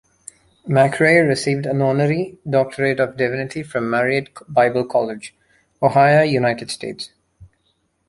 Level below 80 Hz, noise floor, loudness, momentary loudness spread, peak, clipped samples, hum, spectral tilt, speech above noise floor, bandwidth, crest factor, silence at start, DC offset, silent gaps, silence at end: -56 dBFS; -66 dBFS; -18 LUFS; 14 LU; -2 dBFS; under 0.1%; none; -6 dB/octave; 49 dB; 11.5 kHz; 18 dB; 0.65 s; under 0.1%; none; 0.65 s